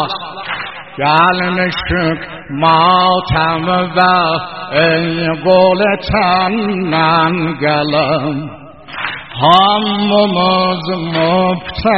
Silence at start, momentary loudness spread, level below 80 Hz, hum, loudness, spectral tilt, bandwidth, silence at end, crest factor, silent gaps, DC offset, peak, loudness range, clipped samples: 0 s; 12 LU; -38 dBFS; none; -13 LUFS; -3 dB/octave; 6 kHz; 0 s; 14 dB; none; 0.6%; 0 dBFS; 1 LU; under 0.1%